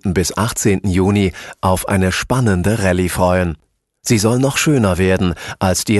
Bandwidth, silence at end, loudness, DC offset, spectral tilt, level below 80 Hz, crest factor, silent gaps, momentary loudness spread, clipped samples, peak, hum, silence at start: 12.5 kHz; 0 s; -16 LUFS; under 0.1%; -5 dB/octave; -30 dBFS; 14 dB; none; 6 LU; under 0.1%; -2 dBFS; none; 0.05 s